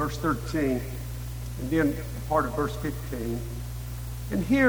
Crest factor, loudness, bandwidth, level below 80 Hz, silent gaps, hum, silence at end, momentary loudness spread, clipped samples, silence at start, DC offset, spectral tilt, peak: 20 dB; -30 LUFS; over 20 kHz; -38 dBFS; none; none; 0 s; 10 LU; under 0.1%; 0 s; under 0.1%; -6.5 dB/octave; -8 dBFS